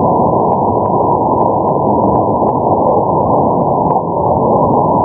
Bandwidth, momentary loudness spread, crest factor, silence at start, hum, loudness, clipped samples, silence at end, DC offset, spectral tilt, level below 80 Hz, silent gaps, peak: 2.5 kHz; 2 LU; 12 dB; 0 s; none; -12 LUFS; under 0.1%; 0 s; under 0.1%; -17 dB/octave; -34 dBFS; none; 0 dBFS